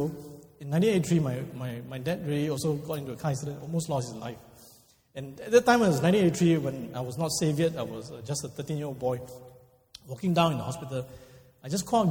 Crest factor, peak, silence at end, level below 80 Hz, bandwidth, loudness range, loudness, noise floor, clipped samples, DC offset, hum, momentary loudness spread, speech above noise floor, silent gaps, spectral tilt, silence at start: 20 dB; -8 dBFS; 0 s; -60 dBFS; 19 kHz; 7 LU; -28 LUFS; -58 dBFS; under 0.1%; under 0.1%; none; 19 LU; 30 dB; none; -6 dB/octave; 0 s